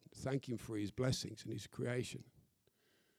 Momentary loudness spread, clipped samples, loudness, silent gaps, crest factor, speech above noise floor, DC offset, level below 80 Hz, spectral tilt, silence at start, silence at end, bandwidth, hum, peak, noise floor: 9 LU; under 0.1%; -42 LUFS; none; 20 dB; 35 dB; under 0.1%; -68 dBFS; -5.5 dB/octave; 0.15 s; 0.8 s; 15 kHz; none; -24 dBFS; -77 dBFS